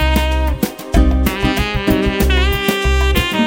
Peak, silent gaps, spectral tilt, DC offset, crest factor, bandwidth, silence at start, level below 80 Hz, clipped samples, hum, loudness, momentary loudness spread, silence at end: 0 dBFS; none; -5.5 dB/octave; under 0.1%; 14 dB; 17.5 kHz; 0 s; -18 dBFS; under 0.1%; none; -16 LUFS; 3 LU; 0 s